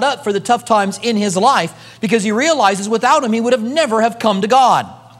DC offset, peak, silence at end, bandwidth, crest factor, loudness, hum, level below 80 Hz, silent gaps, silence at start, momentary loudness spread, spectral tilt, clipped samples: under 0.1%; 0 dBFS; 0.25 s; 14 kHz; 14 dB; -14 LUFS; none; -64 dBFS; none; 0 s; 5 LU; -4 dB/octave; under 0.1%